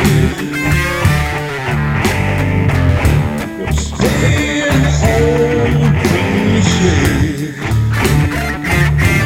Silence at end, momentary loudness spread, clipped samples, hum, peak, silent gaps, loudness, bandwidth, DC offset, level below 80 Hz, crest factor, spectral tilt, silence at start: 0 s; 6 LU; under 0.1%; none; 0 dBFS; none; -14 LUFS; 16.5 kHz; under 0.1%; -22 dBFS; 12 dB; -5.5 dB/octave; 0 s